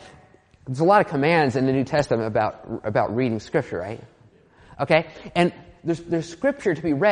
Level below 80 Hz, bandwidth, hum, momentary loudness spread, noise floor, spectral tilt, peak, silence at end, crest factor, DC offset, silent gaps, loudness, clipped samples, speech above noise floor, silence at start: -56 dBFS; 10 kHz; none; 13 LU; -53 dBFS; -6.5 dB/octave; -2 dBFS; 0 s; 20 dB; under 0.1%; none; -23 LUFS; under 0.1%; 31 dB; 0 s